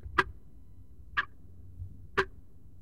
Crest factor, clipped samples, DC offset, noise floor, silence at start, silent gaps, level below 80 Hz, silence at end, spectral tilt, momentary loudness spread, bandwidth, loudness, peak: 30 dB; under 0.1%; 0.4%; -55 dBFS; 0.05 s; none; -52 dBFS; 0 s; -5 dB/octave; 24 LU; 15.5 kHz; -34 LUFS; -8 dBFS